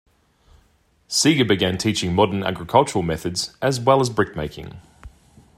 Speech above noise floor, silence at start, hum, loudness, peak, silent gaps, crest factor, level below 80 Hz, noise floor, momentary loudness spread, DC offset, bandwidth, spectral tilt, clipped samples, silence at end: 40 dB; 1.1 s; none; -20 LUFS; -2 dBFS; none; 20 dB; -50 dBFS; -60 dBFS; 9 LU; under 0.1%; 16 kHz; -4.5 dB/octave; under 0.1%; 0.5 s